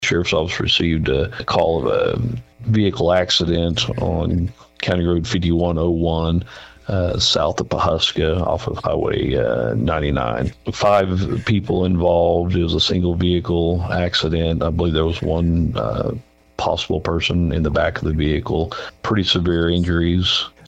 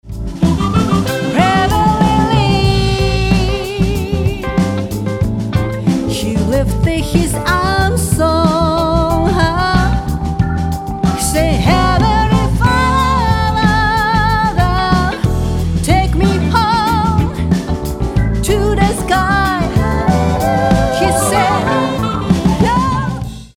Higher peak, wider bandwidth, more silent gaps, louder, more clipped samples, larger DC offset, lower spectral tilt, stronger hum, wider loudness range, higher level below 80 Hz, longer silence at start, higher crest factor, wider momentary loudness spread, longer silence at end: second, -4 dBFS vs 0 dBFS; second, 8.2 kHz vs 17 kHz; neither; second, -19 LUFS vs -14 LUFS; neither; neither; about the same, -5.5 dB/octave vs -5.5 dB/octave; neither; about the same, 2 LU vs 3 LU; second, -32 dBFS vs -22 dBFS; about the same, 0 s vs 0.05 s; about the same, 14 dB vs 12 dB; about the same, 6 LU vs 5 LU; about the same, 0.2 s vs 0.1 s